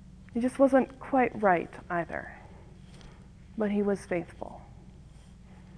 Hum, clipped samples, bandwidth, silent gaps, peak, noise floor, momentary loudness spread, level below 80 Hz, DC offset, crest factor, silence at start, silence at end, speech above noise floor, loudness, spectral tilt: none; under 0.1%; 11 kHz; none; -10 dBFS; -51 dBFS; 25 LU; -54 dBFS; under 0.1%; 20 dB; 0.05 s; 0 s; 23 dB; -29 LUFS; -7.5 dB/octave